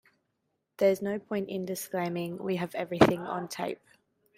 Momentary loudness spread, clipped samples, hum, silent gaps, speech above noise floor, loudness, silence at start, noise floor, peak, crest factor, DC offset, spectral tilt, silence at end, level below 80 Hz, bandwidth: 11 LU; under 0.1%; none; none; 50 dB; -30 LUFS; 0.8 s; -80 dBFS; -4 dBFS; 26 dB; under 0.1%; -5.5 dB/octave; 0.6 s; -62 dBFS; 16 kHz